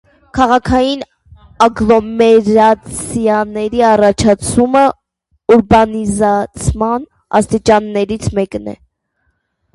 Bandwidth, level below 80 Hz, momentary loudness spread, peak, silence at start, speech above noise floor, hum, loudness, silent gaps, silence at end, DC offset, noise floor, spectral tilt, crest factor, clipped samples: 11.5 kHz; -34 dBFS; 11 LU; 0 dBFS; 0.35 s; 53 dB; none; -12 LUFS; none; 1 s; under 0.1%; -65 dBFS; -5.5 dB/octave; 12 dB; under 0.1%